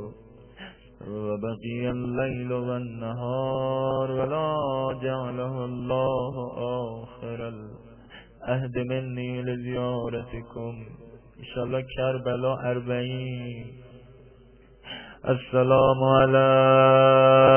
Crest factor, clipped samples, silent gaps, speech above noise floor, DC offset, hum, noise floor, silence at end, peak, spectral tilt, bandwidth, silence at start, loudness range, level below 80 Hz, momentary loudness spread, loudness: 20 dB; under 0.1%; none; 29 dB; under 0.1%; none; -53 dBFS; 0 s; -6 dBFS; -10.5 dB/octave; 3.3 kHz; 0 s; 10 LU; -52 dBFS; 21 LU; -25 LUFS